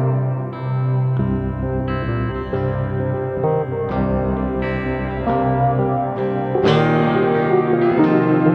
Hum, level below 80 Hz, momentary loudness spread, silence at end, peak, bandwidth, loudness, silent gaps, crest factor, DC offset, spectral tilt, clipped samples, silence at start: none; -34 dBFS; 7 LU; 0 s; -2 dBFS; 6.2 kHz; -19 LUFS; none; 16 dB; under 0.1%; -9.5 dB/octave; under 0.1%; 0 s